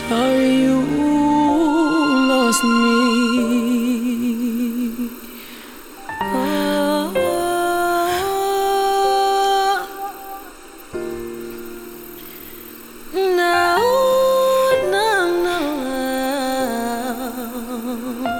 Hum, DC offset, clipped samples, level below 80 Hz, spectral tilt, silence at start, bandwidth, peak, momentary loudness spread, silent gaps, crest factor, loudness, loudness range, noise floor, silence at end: none; under 0.1%; under 0.1%; -46 dBFS; -4 dB/octave; 0 s; 20 kHz; -4 dBFS; 19 LU; none; 14 dB; -18 LUFS; 7 LU; -38 dBFS; 0 s